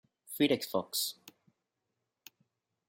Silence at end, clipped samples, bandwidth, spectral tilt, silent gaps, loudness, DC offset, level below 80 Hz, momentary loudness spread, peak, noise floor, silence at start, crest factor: 1.6 s; under 0.1%; 16.5 kHz; -3.5 dB/octave; none; -32 LUFS; under 0.1%; -80 dBFS; 16 LU; -16 dBFS; -86 dBFS; 0.3 s; 22 dB